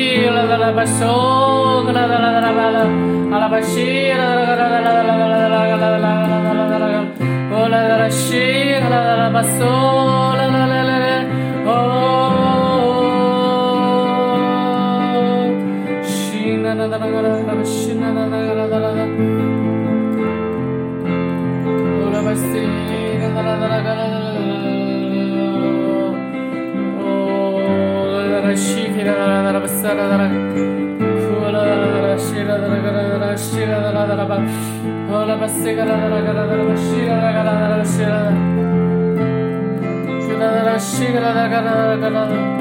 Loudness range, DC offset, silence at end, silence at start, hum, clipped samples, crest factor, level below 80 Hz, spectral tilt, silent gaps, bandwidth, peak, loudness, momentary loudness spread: 4 LU; under 0.1%; 0 s; 0 s; none; under 0.1%; 12 dB; -58 dBFS; -5.5 dB/octave; none; 16.5 kHz; -4 dBFS; -16 LUFS; 6 LU